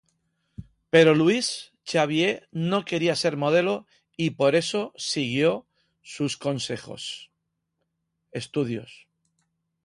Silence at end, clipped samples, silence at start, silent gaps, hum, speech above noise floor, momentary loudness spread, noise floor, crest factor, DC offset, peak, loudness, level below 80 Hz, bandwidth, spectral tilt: 0.9 s; under 0.1%; 0.6 s; none; none; 55 dB; 15 LU; -79 dBFS; 20 dB; under 0.1%; -6 dBFS; -24 LUFS; -64 dBFS; 11.5 kHz; -5 dB/octave